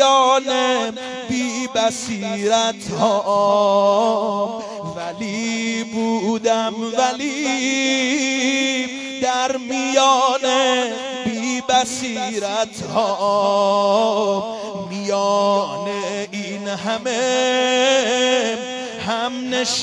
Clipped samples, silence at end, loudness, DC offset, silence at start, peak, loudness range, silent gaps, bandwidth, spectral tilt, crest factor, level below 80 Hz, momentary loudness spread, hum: under 0.1%; 0 s; -19 LUFS; under 0.1%; 0 s; -2 dBFS; 3 LU; none; 11 kHz; -3 dB/octave; 18 dB; -62 dBFS; 10 LU; none